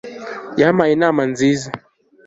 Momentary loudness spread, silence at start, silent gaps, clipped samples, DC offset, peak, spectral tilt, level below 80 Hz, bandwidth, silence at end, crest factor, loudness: 16 LU; 0.05 s; none; under 0.1%; under 0.1%; -2 dBFS; -6 dB/octave; -56 dBFS; 8 kHz; 0.5 s; 16 dB; -16 LUFS